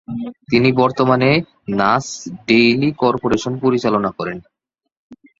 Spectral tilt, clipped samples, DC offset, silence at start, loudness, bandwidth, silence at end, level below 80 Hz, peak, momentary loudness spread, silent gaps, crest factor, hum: -6 dB/octave; under 0.1%; under 0.1%; 0.1 s; -16 LUFS; 7.8 kHz; 0.25 s; -50 dBFS; 0 dBFS; 14 LU; 4.97-5.10 s; 18 dB; none